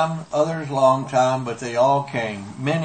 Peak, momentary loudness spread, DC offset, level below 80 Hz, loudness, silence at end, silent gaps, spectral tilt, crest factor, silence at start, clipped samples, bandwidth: -4 dBFS; 8 LU; under 0.1%; -62 dBFS; -21 LUFS; 0 s; none; -6 dB/octave; 16 dB; 0 s; under 0.1%; 8.8 kHz